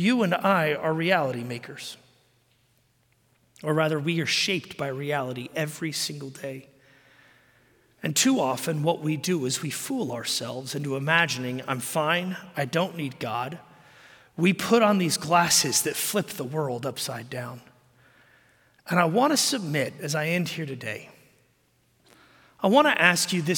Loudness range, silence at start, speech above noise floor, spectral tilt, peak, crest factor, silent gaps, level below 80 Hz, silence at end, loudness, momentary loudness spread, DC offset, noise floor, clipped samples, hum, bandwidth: 6 LU; 0 s; 41 dB; -3.5 dB/octave; -2 dBFS; 24 dB; none; -72 dBFS; 0 s; -25 LUFS; 15 LU; under 0.1%; -66 dBFS; under 0.1%; none; 17 kHz